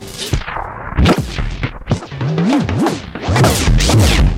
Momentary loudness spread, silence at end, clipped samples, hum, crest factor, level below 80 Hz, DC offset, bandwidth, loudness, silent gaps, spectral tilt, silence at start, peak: 11 LU; 0 s; under 0.1%; none; 12 dB; -20 dBFS; under 0.1%; 16.5 kHz; -16 LUFS; none; -5 dB/octave; 0 s; -2 dBFS